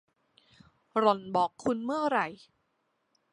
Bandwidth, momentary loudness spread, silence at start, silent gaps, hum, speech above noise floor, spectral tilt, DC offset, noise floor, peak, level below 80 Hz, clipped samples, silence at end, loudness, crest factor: 11 kHz; 6 LU; 0.95 s; none; none; 48 dB; -5.5 dB/octave; under 0.1%; -77 dBFS; -10 dBFS; -74 dBFS; under 0.1%; 1 s; -29 LUFS; 22 dB